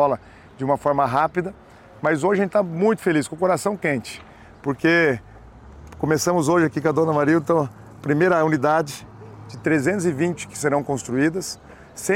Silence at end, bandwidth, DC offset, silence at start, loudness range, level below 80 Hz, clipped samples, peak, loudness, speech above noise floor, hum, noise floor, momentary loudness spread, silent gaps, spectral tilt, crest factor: 0 s; 16.5 kHz; under 0.1%; 0 s; 3 LU; -54 dBFS; under 0.1%; -6 dBFS; -21 LUFS; 23 dB; none; -43 dBFS; 13 LU; none; -5.5 dB/octave; 14 dB